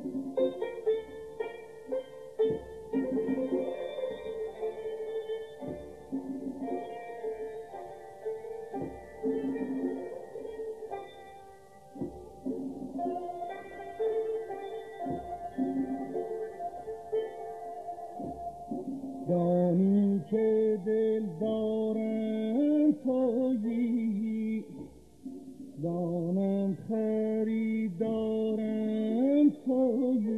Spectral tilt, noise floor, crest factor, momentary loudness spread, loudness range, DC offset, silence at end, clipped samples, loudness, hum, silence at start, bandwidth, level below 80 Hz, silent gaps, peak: -9 dB/octave; -53 dBFS; 16 dB; 15 LU; 10 LU; under 0.1%; 0 s; under 0.1%; -32 LUFS; none; 0 s; 12 kHz; -64 dBFS; none; -16 dBFS